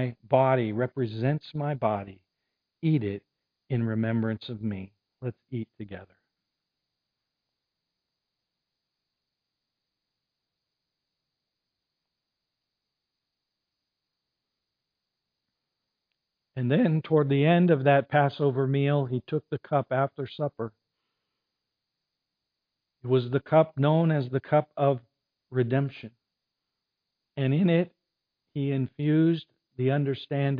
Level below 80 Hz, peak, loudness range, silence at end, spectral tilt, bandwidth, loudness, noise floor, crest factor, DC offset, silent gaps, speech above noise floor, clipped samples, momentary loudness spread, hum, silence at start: -72 dBFS; -8 dBFS; 11 LU; 0 s; -11 dB/octave; 5 kHz; -26 LUFS; -85 dBFS; 22 dB; under 0.1%; none; 59 dB; under 0.1%; 16 LU; none; 0 s